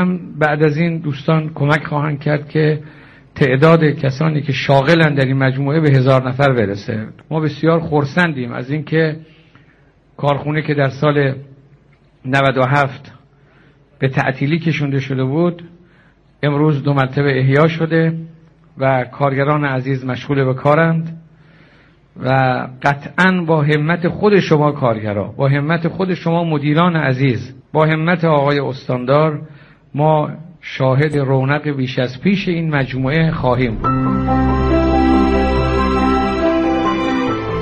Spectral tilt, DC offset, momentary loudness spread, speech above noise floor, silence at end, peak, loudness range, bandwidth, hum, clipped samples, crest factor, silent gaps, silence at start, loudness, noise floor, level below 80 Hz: -8 dB/octave; under 0.1%; 8 LU; 35 dB; 0 s; 0 dBFS; 4 LU; 7.2 kHz; none; under 0.1%; 16 dB; none; 0 s; -16 LUFS; -50 dBFS; -34 dBFS